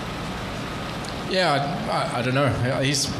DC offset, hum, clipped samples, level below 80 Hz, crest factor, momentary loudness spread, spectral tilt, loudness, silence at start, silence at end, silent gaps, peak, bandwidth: under 0.1%; none; under 0.1%; -44 dBFS; 16 dB; 9 LU; -4.5 dB/octave; -24 LUFS; 0 s; 0 s; none; -8 dBFS; 14 kHz